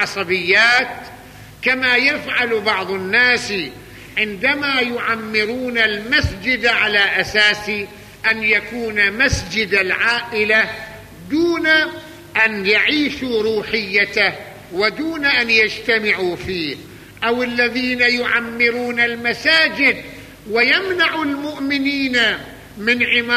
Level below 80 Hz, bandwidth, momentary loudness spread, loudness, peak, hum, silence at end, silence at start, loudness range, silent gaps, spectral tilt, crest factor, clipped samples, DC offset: -42 dBFS; 15 kHz; 10 LU; -16 LUFS; -2 dBFS; none; 0 s; 0 s; 2 LU; none; -3.5 dB/octave; 16 dB; under 0.1%; under 0.1%